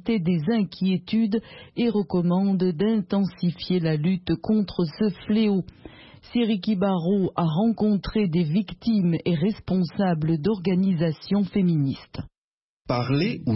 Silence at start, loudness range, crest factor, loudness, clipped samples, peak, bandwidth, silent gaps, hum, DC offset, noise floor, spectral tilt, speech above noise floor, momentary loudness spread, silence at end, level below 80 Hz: 0.05 s; 1 LU; 14 dB; -24 LUFS; under 0.1%; -10 dBFS; 5.8 kHz; 12.38-12.85 s; none; under 0.1%; under -90 dBFS; -11.5 dB/octave; over 67 dB; 5 LU; 0 s; -50 dBFS